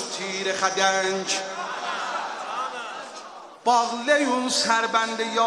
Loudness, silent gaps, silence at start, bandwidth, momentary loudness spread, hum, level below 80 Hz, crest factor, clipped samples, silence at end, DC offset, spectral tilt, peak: -24 LUFS; none; 0 s; 13 kHz; 13 LU; none; -76 dBFS; 20 dB; under 0.1%; 0 s; under 0.1%; -1.5 dB/octave; -4 dBFS